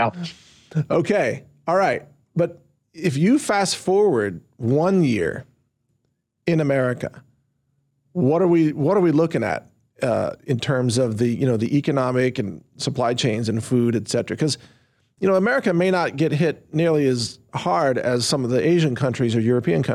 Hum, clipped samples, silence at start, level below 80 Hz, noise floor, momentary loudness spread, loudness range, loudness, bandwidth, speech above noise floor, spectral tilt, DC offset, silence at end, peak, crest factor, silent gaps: none; under 0.1%; 0 s; -62 dBFS; -72 dBFS; 10 LU; 3 LU; -21 LUFS; 14 kHz; 52 dB; -6 dB/octave; under 0.1%; 0 s; -8 dBFS; 12 dB; none